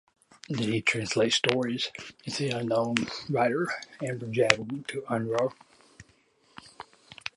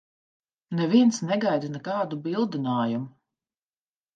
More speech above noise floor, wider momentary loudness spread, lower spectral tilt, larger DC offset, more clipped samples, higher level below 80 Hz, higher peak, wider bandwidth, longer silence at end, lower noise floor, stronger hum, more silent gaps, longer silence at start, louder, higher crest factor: second, 36 dB vs over 66 dB; about the same, 13 LU vs 11 LU; second, -4 dB/octave vs -6 dB/octave; neither; neither; first, -66 dBFS vs -76 dBFS; first, 0 dBFS vs -8 dBFS; first, 11.5 kHz vs 9 kHz; second, 0.1 s vs 1.05 s; second, -64 dBFS vs under -90 dBFS; neither; neither; second, 0.5 s vs 0.7 s; second, -28 LUFS vs -25 LUFS; first, 30 dB vs 18 dB